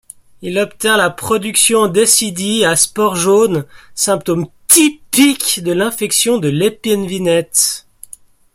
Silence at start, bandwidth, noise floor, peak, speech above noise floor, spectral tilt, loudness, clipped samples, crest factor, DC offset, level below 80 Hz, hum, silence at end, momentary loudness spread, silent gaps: 0.4 s; 16.5 kHz; -41 dBFS; 0 dBFS; 27 dB; -3 dB/octave; -13 LUFS; under 0.1%; 14 dB; under 0.1%; -52 dBFS; none; 0.75 s; 9 LU; none